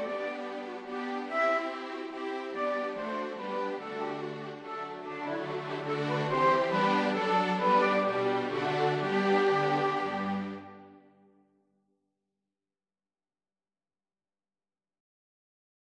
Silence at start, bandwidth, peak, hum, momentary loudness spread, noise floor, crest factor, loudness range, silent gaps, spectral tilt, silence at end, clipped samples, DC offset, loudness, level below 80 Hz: 0 s; 9.8 kHz; -14 dBFS; none; 13 LU; under -90 dBFS; 18 dB; 8 LU; none; -6 dB/octave; 4.9 s; under 0.1%; under 0.1%; -30 LUFS; -74 dBFS